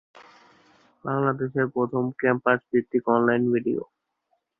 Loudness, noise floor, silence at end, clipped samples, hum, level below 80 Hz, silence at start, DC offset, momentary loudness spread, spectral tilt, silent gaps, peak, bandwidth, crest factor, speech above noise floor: -24 LUFS; -74 dBFS; 0.75 s; under 0.1%; none; -66 dBFS; 0.15 s; under 0.1%; 8 LU; -10 dB/octave; none; -4 dBFS; 5 kHz; 20 dB; 50 dB